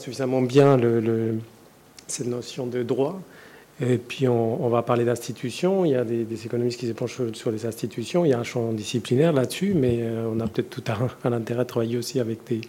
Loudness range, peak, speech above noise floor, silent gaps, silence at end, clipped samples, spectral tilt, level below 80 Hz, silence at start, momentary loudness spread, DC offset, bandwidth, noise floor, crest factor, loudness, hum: 3 LU; -6 dBFS; 26 dB; none; 0 s; under 0.1%; -6.5 dB/octave; -62 dBFS; 0 s; 9 LU; under 0.1%; 16.5 kHz; -50 dBFS; 18 dB; -24 LUFS; none